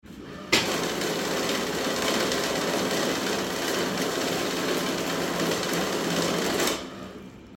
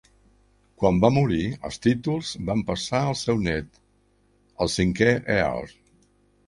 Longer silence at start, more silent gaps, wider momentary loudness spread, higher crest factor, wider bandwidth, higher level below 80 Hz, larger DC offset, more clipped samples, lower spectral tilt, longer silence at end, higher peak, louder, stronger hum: second, 0.05 s vs 0.8 s; neither; second, 3 LU vs 9 LU; about the same, 20 dB vs 22 dB; first, 18 kHz vs 11.5 kHz; second, -56 dBFS vs -46 dBFS; neither; neither; second, -3 dB/octave vs -6 dB/octave; second, 0 s vs 0.8 s; second, -8 dBFS vs -4 dBFS; about the same, -26 LUFS vs -24 LUFS; second, none vs 50 Hz at -50 dBFS